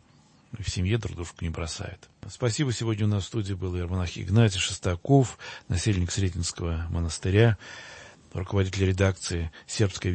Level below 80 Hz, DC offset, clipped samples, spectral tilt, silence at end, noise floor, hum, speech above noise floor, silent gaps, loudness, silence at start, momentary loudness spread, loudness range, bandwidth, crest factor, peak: -44 dBFS; under 0.1%; under 0.1%; -5.5 dB/octave; 0 s; -58 dBFS; none; 32 dB; none; -27 LUFS; 0.55 s; 15 LU; 4 LU; 8.8 kHz; 20 dB; -6 dBFS